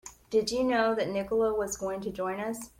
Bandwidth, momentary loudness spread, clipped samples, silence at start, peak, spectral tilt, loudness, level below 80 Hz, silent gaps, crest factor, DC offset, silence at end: 16.5 kHz; 7 LU; under 0.1%; 0.05 s; -14 dBFS; -4 dB/octave; -29 LUFS; -58 dBFS; none; 16 dB; under 0.1%; 0.1 s